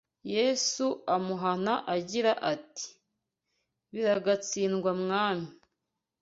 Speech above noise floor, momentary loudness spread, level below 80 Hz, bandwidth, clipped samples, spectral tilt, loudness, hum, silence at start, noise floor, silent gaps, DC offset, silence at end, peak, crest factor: 56 dB; 10 LU; -74 dBFS; 8 kHz; under 0.1%; -3.5 dB/octave; -29 LUFS; none; 0.25 s; -85 dBFS; none; under 0.1%; 0.7 s; -12 dBFS; 18 dB